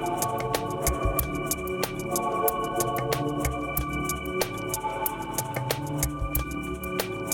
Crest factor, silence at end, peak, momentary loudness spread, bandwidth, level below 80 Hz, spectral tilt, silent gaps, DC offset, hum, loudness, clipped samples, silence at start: 22 dB; 0 s; -6 dBFS; 4 LU; 19.5 kHz; -38 dBFS; -4 dB/octave; none; under 0.1%; none; -28 LUFS; under 0.1%; 0 s